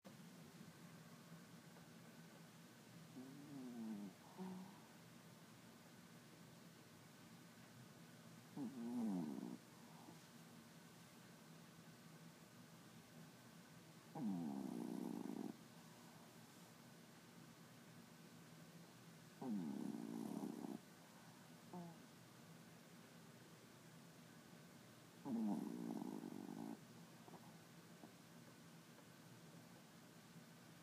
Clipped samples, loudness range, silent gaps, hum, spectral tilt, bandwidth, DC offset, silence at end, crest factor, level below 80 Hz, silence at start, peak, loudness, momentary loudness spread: under 0.1%; 11 LU; none; none; -5.5 dB/octave; 15.5 kHz; under 0.1%; 0 s; 20 dB; under -90 dBFS; 0.05 s; -34 dBFS; -55 LUFS; 15 LU